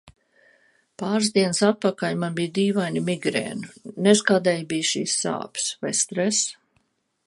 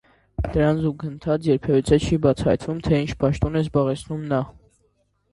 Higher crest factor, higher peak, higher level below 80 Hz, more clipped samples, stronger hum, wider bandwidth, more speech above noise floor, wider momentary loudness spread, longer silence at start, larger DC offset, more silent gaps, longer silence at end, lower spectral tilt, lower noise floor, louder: about the same, 22 dB vs 18 dB; about the same, -2 dBFS vs -4 dBFS; second, -68 dBFS vs -38 dBFS; neither; neither; about the same, 11.5 kHz vs 11.5 kHz; about the same, 46 dB vs 45 dB; about the same, 8 LU vs 9 LU; second, 0.05 s vs 0.4 s; neither; neither; about the same, 0.75 s vs 0.8 s; second, -3.5 dB/octave vs -7.5 dB/octave; about the same, -69 dBFS vs -66 dBFS; about the same, -23 LUFS vs -22 LUFS